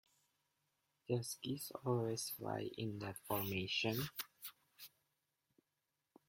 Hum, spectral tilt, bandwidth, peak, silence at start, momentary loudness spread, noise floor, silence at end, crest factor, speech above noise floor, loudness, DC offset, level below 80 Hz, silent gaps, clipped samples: none; -4.5 dB/octave; 16.5 kHz; -24 dBFS; 1.1 s; 19 LU; -89 dBFS; 1.4 s; 22 dB; 47 dB; -42 LUFS; under 0.1%; -76 dBFS; none; under 0.1%